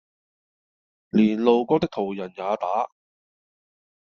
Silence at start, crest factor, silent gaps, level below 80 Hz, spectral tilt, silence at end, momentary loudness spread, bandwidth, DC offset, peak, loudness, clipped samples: 1.15 s; 20 dB; none; -62 dBFS; -6 dB/octave; 1.2 s; 10 LU; 6.6 kHz; under 0.1%; -4 dBFS; -23 LUFS; under 0.1%